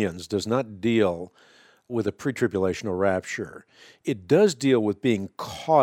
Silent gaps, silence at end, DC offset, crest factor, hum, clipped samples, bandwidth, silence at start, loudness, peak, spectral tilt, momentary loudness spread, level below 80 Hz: none; 0 s; under 0.1%; 18 dB; none; under 0.1%; 15.5 kHz; 0 s; -25 LUFS; -6 dBFS; -6 dB/octave; 13 LU; -62 dBFS